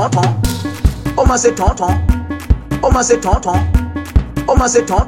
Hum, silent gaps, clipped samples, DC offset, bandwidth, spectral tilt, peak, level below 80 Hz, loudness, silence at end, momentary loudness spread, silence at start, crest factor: none; none; under 0.1%; under 0.1%; 16.5 kHz; -5.5 dB/octave; 0 dBFS; -18 dBFS; -15 LUFS; 0 s; 6 LU; 0 s; 12 dB